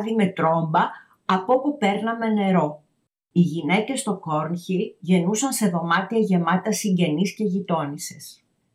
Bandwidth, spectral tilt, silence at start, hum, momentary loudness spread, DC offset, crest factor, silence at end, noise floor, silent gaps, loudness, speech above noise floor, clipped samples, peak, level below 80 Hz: 15.5 kHz; -5.5 dB/octave; 0 s; none; 6 LU; under 0.1%; 16 dB; 0.4 s; -71 dBFS; none; -22 LUFS; 49 dB; under 0.1%; -8 dBFS; -78 dBFS